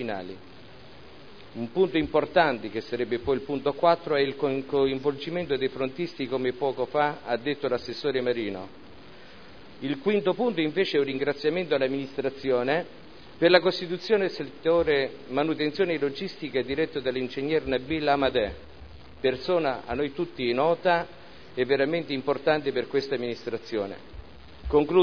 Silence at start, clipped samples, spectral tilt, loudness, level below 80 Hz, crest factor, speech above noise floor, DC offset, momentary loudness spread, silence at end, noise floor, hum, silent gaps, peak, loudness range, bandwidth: 0 s; under 0.1%; -7 dB/octave; -27 LUFS; -52 dBFS; 22 dB; 22 dB; 0.4%; 9 LU; 0 s; -48 dBFS; none; none; -4 dBFS; 3 LU; 5.4 kHz